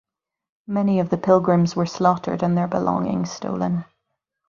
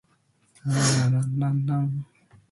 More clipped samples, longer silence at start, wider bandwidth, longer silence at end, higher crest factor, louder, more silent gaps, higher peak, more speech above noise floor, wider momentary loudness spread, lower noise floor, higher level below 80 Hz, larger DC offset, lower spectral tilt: neither; about the same, 0.7 s vs 0.65 s; second, 7.2 kHz vs 11.5 kHz; first, 0.65 s vs 0.5 s; about the same, 20 dB vs 16 dB; first, -21 LUFS vs -25 LUFS; neither; first, -2 dBFS vs -10 dBFS; first, 57 dB vs 42 dB; second, 8 LU vs 14 LU; first, -78 dBFS vs -65 dBFS; about the same, -58 dBFS vs -60 dBFS; neither; first, -7.5 dB/octave vs -5 dB/octave